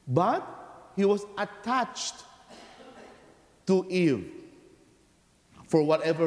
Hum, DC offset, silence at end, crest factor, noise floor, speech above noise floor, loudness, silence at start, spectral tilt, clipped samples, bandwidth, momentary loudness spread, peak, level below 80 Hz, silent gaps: none; under 0.1%; 0 s; 20 dB; -63 dBFS; 37 dB; -28 LUFS; 0.05 s; -6 dB/octave; under 0.1%; 11 kHz; 24 LU; -10 dBFS; -68 dBFS; none